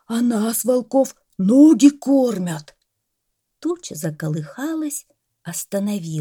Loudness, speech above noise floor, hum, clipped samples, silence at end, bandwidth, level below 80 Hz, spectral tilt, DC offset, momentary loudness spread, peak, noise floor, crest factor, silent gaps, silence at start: -19 LUFS; 57 dB; none; under 0.1%; 0 s; 18.5 kHz; -68 dBFS; -6 dB/octave; under 0.1%; 16 LU; -2 dBFS; -75 dBFS; 18 dB; none; 0.1 s